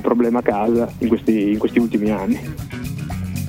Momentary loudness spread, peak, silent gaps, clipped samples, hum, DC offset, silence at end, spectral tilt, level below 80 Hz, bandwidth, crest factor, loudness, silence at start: 10 LU; -2 dBFS; none; under 0.1%; none; under 0.1%; 0 s; -7.5 dB/octave; -42 dBFS; 16.5 kHz; 16 dB; -20 LUFS; 0 s